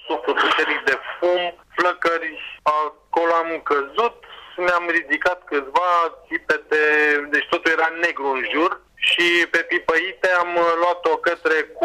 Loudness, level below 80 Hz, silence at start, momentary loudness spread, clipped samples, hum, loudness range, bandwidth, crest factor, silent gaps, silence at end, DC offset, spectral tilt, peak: -20 LUFS; -60 dBFS; 0.05 s; 7 LU; under 0.1%; none; 3 LU; 15 kHz; 12 dB; none; 0 s; under 0.1%; -2.5 dB/octave; -8 dBFS